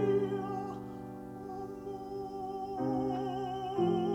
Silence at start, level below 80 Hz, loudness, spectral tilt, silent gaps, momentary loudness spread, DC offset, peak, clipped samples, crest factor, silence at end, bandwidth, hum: 0 s; -62 dBFS; -36 LUFS; -8 dB/octave; none; 12 LU; under 0.1%; -18 dBFS; under 0.1%; 16 dB; 0 s; 13.5 kHz; none